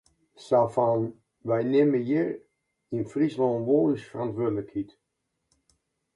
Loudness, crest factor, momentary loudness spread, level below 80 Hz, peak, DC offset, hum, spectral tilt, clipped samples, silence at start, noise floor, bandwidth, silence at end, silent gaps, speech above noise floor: -26 LUFS; 16 dB; 13 LU; -66 dBFS; -10 dBFS; under 0.1%; none; -8.5 dB/octave; under 0.1%; 0.4 s; -80 dBFS; 11 kHz; 1.3 s; none; 55 dB